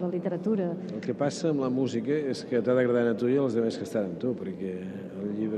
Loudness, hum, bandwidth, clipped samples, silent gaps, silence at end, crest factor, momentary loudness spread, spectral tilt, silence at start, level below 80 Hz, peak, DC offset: -29 LUFS; none; 11.5 kHz; under 0.1%; none; 0 s; 16 dB; 10 LU; -7 dB/octave; 0 s; -72 dBFS; -12 dBFS; under 0.1%